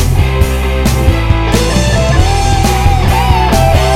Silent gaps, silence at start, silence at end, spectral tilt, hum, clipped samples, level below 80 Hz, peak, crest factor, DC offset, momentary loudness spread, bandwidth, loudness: none; 0 s; 0 s; -5.5 dB/octave; none; 0.2%; -14 dBFS; 0 dBFS; 10 dB; under 0.1%; 3 LU; 16.5 kHz; -11 LUFS